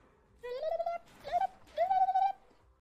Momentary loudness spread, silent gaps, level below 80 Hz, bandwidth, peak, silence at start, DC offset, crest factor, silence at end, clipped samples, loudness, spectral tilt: 15 LU; none; -68 dBFS; 8.4 kHz; -20 dBFS; 0.45 s; under 0.1%; 14 dB; 0.45 s; under 0.1%; -34 LUFS; -3.5 dB/octave